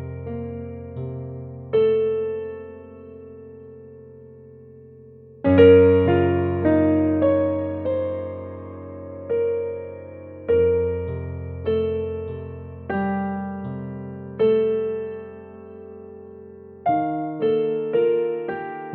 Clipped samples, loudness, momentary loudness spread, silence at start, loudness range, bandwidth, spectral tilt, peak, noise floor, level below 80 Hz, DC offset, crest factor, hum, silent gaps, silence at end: under 0.1%; -22 LUFS; 22 LU; 0 s; 9 LU; 4.3 kHz; -11 dB/octave; -2 dBFS; -45 dBFS; -50 dBFS; under 0.1%; 20 dB; none; none; 0 s